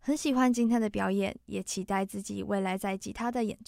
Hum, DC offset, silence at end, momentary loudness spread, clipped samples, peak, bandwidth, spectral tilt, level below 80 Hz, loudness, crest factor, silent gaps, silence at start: none; under 0.1%; 0.05 s; 9 LU; under 0.1%; -12 dBFS; 16 kHz; -5 dB/octave; -58 dBFS; -30 LUFS; 18 dB; none; 0.05 s